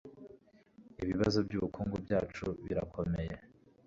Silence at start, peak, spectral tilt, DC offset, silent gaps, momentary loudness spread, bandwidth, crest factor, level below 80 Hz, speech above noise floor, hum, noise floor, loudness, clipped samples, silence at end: 0.05 s; -16 dBFS; -6.5 dB/octave; under 0.1%; none; 18 LU; 7.6 kHz; 20 dB; -52 dBFS; 27 dB; none; -62 dBFS; -36 LUFS; under 0.1%; 0.4 s